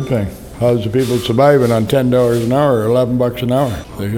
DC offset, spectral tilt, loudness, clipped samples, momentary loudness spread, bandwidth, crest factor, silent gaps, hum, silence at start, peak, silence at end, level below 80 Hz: under 0.1%; -7 dB/octave; -14 LUFS; under 0.1%; 8 LU; 17.5 kHz; 14 dB; none; none; 0 s; 0 dBFS; 0 s; -38 dBFS